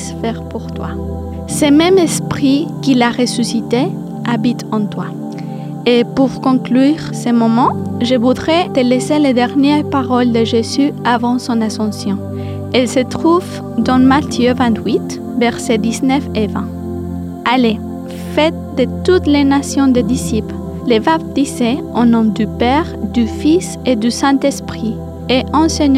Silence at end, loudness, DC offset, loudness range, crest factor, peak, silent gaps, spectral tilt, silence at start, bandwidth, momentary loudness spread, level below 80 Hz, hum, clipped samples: 0 s; -14 LUFS; under 0.1%; 3 LU; 14 dB; 0 dBFS; none; -5.5 dB/octave; 0 s; 15 kHz; 11 LU; -42 dBFS; none; under 0.1%